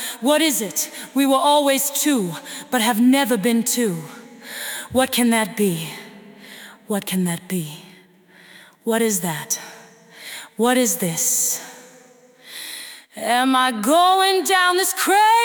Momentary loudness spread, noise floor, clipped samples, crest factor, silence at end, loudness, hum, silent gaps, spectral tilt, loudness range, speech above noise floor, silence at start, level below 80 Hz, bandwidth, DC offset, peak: 19 LU; -50 dBFS; under 0.1%; 16 dB; 0 s; -19 LUFS; none; none; -3 dB/octave; 7 LU; 31 dB; 0 s; -68 dBFS; 19.5 kHz; under 0.1%; -4 dBFS